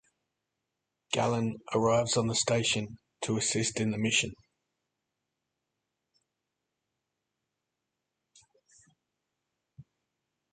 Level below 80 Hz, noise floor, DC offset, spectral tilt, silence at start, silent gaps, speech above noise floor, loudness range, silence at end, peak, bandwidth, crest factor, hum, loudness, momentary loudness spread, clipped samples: -66 dBFS; -86 dBFS; under 0.1%; -3.5 dB/octave; 1.1 s; none; 57 dB; 6 LU; 0.7 s; -12 dBFS; 9.6 kHz; 24 dB; none; -29 LUFS; 7 LU; under 0.1%